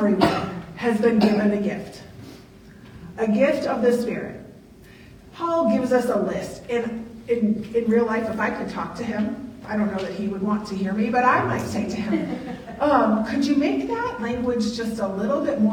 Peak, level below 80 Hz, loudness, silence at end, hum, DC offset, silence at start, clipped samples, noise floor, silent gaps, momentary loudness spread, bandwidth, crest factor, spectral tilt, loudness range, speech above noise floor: -2 dBFS; -52 dBFS; -23 LUFS; 0 s; none; under 0.1%; 0 s; under 0.1%; -46 dBFS; none; 13 LU; 15 kHz; 22 dB; -6.5 dB/octave; 3 LU; 24 dB